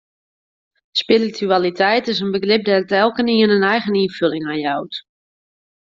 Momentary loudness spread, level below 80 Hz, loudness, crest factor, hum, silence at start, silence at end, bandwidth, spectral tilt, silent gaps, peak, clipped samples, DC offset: 8 LU; -62 dBFS; -17 LUFS; 16 dB; none; 0.95 s; 0.9 s; 7.6 kHz; -6 dB/octave; none; -2 dBFS; under 0.1%; under 0.1%